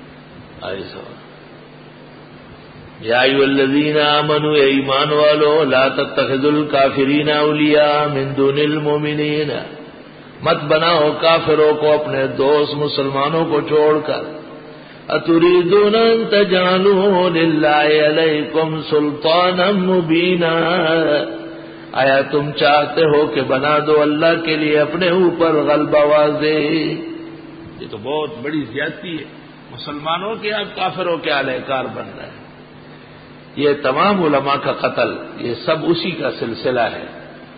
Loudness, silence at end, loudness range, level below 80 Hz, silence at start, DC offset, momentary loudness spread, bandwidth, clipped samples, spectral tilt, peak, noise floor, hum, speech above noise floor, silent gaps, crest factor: -15 LUFS; 0 s; 8 LU; -54 dBFS; 0 s; under 0.1%; 16 LU; 5 kHz; under 0.1%; -11 dB/octave; 0 dBFS; -39 dBFS; none; 24 dB; none; 16 dB